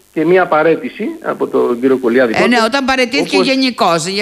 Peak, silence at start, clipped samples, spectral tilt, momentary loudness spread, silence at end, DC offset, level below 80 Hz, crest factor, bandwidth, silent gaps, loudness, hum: 0 dBFS; 0.15 s; under 0.1%; -4 dB/octave; 7 LU; 0 s; under 0.1%; -52 dBFS; 12 dB; 14.5 kHz; none; -13 LUFS; none